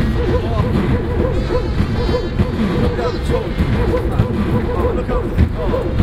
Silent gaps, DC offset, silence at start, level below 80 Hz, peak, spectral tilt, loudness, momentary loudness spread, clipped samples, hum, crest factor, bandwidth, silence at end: none; under 0.1%; 0 s; -22 dBFS; 0 dBFS; -8 dB/octave; -18 LUFS; 2 LU; under 0.1%; none; 16 dB; 13 kHz; 0 s